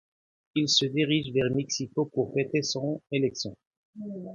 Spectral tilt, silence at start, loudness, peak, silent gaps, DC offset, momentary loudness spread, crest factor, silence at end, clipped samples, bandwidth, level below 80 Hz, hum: -4.5 dB/octave; 0.55 s; -27 LUFS; -8 dBFS; 3.67-3.71 s, 3.77-3.93 s; under 0.1%; 13 LU; 20 dB; 0 s; under 0.1%; 7.6 kHz; -64 dBFS; none